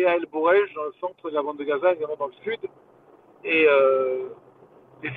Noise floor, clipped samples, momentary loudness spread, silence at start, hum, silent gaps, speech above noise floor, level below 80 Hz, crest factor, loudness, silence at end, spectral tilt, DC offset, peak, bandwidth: -52 dBFS; under 0.1%; 15 LU; 0 s; none; none; 29 dB; -70 dBFS; 16 dB; -23 LUFS; 0 s; -8 dB/octave; under 0.1%; -8 dBFS; 4.2 kHz